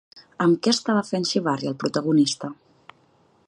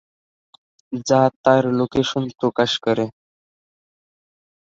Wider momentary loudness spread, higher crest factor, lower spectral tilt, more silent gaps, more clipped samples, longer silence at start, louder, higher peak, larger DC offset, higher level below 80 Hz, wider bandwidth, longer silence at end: second, 6 LU vs 10 LU; about the same, 20 dB vs 20 dB; about the same, -4.5 dB/octave vs -5.5 dB/octave; second, none vs 1.36-1.44 s; neither; second, 0.15 s vs 0.9 s; second, -22 LUFS vs -19 LUFS; about the same, -4 dBFS vs -2 dBFS; neither; second, -70 dBFS vs -58 dBFS; first, 11 kHz vs 7.8 kHz; second, 0.95 s vs 1.55 s